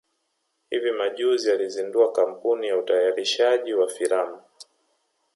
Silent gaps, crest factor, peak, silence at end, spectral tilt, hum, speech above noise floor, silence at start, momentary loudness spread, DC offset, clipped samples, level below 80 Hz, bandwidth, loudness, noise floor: none; 16 dB; -8 dBFS; 0.75 s; -2 dB/octave; none; 52 dB; 0.7 s; 5 LU; under 0.1%; under 0.1%; -82 dBFS; 11.5 kHz; -23 LUFS; -74 dBFS